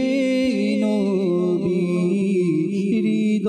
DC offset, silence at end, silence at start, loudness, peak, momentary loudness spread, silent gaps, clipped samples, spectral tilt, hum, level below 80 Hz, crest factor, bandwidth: under 0.1%; 0 s; 0 s; -20 LUFS; -12 dBFS; 1 LU; none; under 0.1%; -7.5 dB/octave; none; -60 dBFS; 8 dB; 10.5 kHz